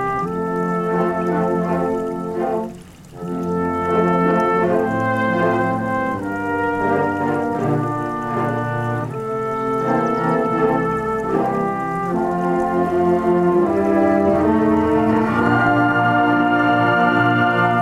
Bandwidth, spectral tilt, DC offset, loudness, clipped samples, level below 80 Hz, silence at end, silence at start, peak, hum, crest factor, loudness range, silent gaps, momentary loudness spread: 14 kHz; -8 dB/octave; under 0.1%; -18 LUFS; under 0.1%; -48 dBFS; 0 s; 0 s; -4 dBFS; none; 14 dB; 5 LU; none; 7 LU